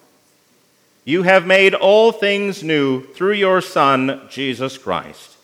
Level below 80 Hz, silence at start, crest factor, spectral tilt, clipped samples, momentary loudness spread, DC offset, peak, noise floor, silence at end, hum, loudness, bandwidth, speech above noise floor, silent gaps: -68 dBFS; 1.05 s; 16 dB; -5 dB/octave; under 0.1%; 12 LU; under 0.1%; 0 dBFS; -57 dBFS; 0.3 s; none; -16 LUFS; 15.5 kHz; 41 dB; none